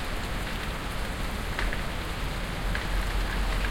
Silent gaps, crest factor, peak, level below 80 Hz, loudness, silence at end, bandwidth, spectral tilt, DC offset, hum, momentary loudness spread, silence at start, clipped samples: none; 18 dB; -12 dBFS; -32 dBFS; -32 LUFS; 0 s; 17 kHz; -4.5 dB/octave; under 0.1%; none; 3 LU; 0 s; under 0.1%